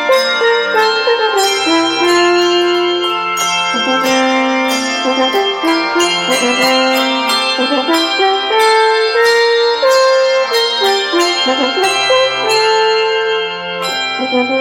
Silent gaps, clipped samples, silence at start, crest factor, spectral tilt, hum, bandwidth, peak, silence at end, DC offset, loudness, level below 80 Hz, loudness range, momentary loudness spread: none; under 0.1%; 0 s; 12 dB; -1.5 dB/octave; none; 16.5 kHz; 0 dBFS; 0 s; under 0.1%; -12 LUFS; -56 dBFS; 2 LU; 4 LU